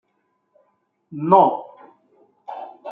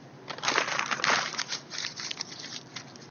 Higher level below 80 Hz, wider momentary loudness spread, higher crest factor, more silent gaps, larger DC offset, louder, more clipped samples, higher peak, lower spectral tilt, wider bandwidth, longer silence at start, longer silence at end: about the same, -76 dBFS vs -78 dBFS; first, 22 LU vs 15 LU; second, 22 dB vs 28 dB; neither; neither; first, -17 LUFS vs -30 LUFS; neither; about the same, -2 dBFS vs -4 dBFS; first, -10.5 dB/octave vs -1 dB/octave; second, 4.6 kHz vs 7.4 kHz; first, 1.1 s vs 0 s; about the same, 0 s vs 0 s